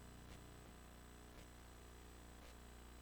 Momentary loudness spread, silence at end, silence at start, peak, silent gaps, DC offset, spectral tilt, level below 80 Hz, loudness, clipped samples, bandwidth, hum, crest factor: 2 LU; 0 s; 0 s; -44 dBFS; none; under 0.1%; -4.5 dB/octave; -62 dBFS; -60 LUFS; under 0.1%; over 20 kHz; 60 Hz at -65 dBFS; 14 dB